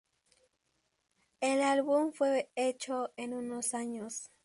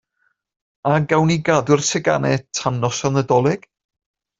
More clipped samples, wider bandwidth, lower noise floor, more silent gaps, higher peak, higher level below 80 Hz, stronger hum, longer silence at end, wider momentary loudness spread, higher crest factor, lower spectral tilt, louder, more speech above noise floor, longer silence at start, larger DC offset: neither; first, 11.5 kHz vs 7.8 kHz; first, -79 dBFS vs -68 dBFS; neither; second, -18 dBFS vs -2 dBFS; second, -82 dBFS vs -54 dBFS; neither; second, 0.2 s vs 0.8 s; first, 10 LU vs 5 LU; about the same, 16 dB vs 18 dB; second, -2.5 dB/octave vs -5 dB/octave; second, -33 LUFS vs -18 LUFS; second, 46 dB vs 50 dB; first, 1.4 s vs 0.85 s; neither